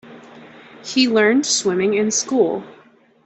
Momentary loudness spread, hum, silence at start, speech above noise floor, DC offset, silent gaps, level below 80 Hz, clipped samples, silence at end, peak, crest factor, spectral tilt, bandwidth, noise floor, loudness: 8 LU; none; 0.05 s; 24 dB; under 0.1%; none; -64 dBFS; under 0.1%; 0.55 s; -2 dBFS; 16 dB; -3 dB/octave; 8.4 kHz; -42 dBFS; -17 LUFS